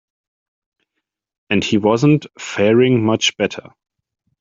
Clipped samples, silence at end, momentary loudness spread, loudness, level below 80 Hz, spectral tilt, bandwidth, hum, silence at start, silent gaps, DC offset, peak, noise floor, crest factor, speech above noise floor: under 0.1%; 0.8 s; 9 LU; -16 LUFS; -58 dBFS; -5.5 dB/octave; 7.8 kHz; none; 1.5 s; none; under 0.1%; -2 dBFS; -78 dBFS; 16 dB; 63 dB